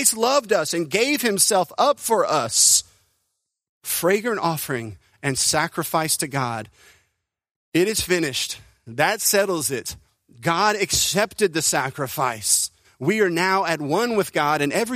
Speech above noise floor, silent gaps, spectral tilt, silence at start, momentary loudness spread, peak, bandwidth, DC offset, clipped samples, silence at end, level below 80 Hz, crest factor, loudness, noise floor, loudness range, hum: 55 dB; 3.69-3.81 s, 7.51-7.72 s; -2.5 dB/octave; 0 s; 10 LU; -2 dBFS; 15.5 kHz; under 0.1%; under 0.1%; 0 s; -54 dBFS; 20 dB; -20 LUFS; -76 dBFS; 5 LU; none